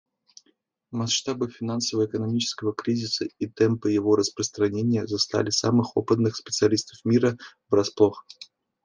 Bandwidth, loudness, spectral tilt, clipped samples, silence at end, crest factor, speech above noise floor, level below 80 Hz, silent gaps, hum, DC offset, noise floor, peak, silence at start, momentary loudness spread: 10 kHz; -24 LUFS; -5 dB/octave; under 0.1%; 0.4 s; 20 dB; 44 dB; -68 dBFS; none; none; under 0.1%; -68 dBFS; -4 dBFS; 0.9 s; 8 LU